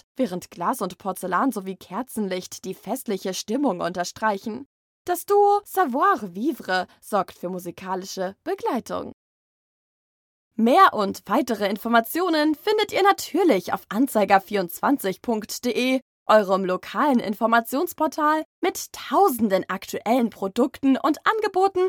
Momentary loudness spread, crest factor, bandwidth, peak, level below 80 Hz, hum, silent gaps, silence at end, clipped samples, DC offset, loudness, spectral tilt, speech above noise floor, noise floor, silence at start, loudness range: 11 LU; 20 dB; 19.5 kHz; -4 dBFS; -68 dBFS; none; 4.66-5.05 s, 9.13-10.51 s, 16.02-16.26 s, 18.45-18.62 s; 0 s; under 0.1%; under 0.1%; -23 LUFS; -4.5 dB/octave; over 67 dB; under -90 dBFS; 0.2 s; 7 LU